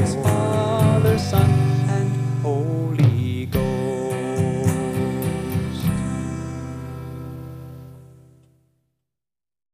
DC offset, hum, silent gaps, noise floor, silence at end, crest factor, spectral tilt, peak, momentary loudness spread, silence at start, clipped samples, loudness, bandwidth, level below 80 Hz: under 0.1%; none; none; under -90 dBFS; 1.6 s; 18 dB; -7 dB/octave; -4 dBFS; 16 LU; 0 s; under 0.1%; -21 LUFS; 15.5 kHz; -42 dBFS